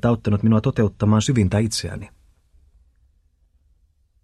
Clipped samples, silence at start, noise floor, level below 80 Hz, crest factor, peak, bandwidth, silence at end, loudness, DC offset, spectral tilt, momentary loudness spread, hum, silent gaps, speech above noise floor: under 0.1%; 0.05 s; -61 dBFS; -44 dBFS; 16 dB; -6 dBFS; 12 kHz; 2.15 s; -20 LUFS; under 0.1%; -6.5 dB/octave; 14 LU; none; none; 42 dB